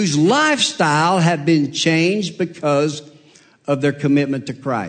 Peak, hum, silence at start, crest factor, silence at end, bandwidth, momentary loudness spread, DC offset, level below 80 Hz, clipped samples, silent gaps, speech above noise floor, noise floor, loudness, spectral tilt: -4 dBFS; none; 0 s; 14 dB; 0 s; 9.4 kHz; 9 LU; under 0.1%; -64 dBFS; under 0.1%; none; 33 dB; -50 dBFS; -17 LUFS; -5 dB/octave